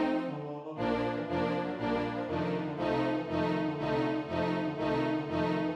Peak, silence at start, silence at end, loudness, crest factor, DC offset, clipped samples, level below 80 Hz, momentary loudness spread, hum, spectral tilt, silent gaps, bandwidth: -18 dBFS; 0 s; 0 s; -32 LUFS; 14 dB; under 0.1%; under 0.1%; -58 dBFS; 3 LU; none; -7.5 dB/octave; none; 8.4 kHz